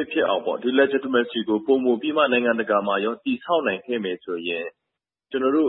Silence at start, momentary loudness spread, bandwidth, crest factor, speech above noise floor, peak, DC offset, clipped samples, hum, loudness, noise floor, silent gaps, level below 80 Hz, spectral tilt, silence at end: 0 s; 8 LU; 4.1 kHz; 18 dB; 62 dB; -6 dBFS; under 0.1%; under 0.1%; none; -23 LUFS; -84 dBFS; none; -72 dBFS; -9.5 dB/octave; 0 s